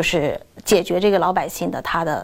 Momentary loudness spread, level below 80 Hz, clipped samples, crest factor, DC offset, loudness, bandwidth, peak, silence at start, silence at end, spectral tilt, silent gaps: 8 LU; -44 dBFS; under 0.1%; 16 dB; under 0.1%; -20 LUFS; 17 kHz; -4 dBFS; 0 s; 0 s; -4.5 dB/octave; none